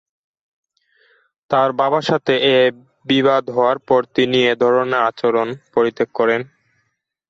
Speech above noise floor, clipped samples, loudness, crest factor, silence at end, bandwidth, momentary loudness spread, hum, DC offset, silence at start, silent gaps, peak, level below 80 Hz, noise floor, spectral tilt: 54 dB; under 0.1%; -17 LUFS; 16 dB; 0.85 s; 7.6 kHz; 5 LU; none; under 0.1%; 1.5 s; none; -4 dBFS; -62 dBFS; -70 dBFS; -5.5 dB/octave